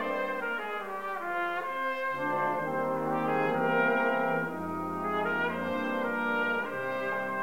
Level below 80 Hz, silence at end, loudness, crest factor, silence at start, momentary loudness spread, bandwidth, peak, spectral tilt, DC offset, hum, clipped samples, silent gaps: -68 dBFS; 0 s; -30 LUFS; 18 dB; 0 s; 7 LU; 16 kHz; -14 dBFS; -6 dB/octave; 0.3%; none; under 0.1%; none